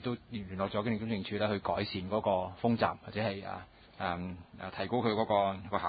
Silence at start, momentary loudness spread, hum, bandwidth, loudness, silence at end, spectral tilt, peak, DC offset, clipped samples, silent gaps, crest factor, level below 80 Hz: 0 s; 11 LU; none; 4.8 kHz; -34 LUFS; 0 s; -4.5 dB/octave; -12 dBFS; under 0.1%; under 0.1%; none; 20 dB; -58 dBFS